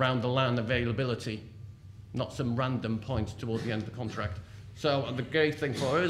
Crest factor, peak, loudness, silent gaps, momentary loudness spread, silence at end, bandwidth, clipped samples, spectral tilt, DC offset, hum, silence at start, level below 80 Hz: 16 dB; -14 dBFS; -31 LUFS; none; 14 LU; 0 s; 12.5 kHz; under 0.1%; -6.5 dB/octave; under 0.1%; none; 0 s; -54 dBFS